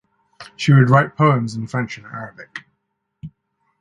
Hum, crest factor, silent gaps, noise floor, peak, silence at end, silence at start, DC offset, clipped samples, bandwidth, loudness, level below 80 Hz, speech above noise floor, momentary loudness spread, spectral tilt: none; 20 dB; none; -73 dBFS; 0 dBFS; 0.55 s; 0.4 s; under 0.1%; under 0.1%; 9 kHz; -17 LUFS; -56 dBFS; 57 dB; 22 LU; -7.5 dB/octave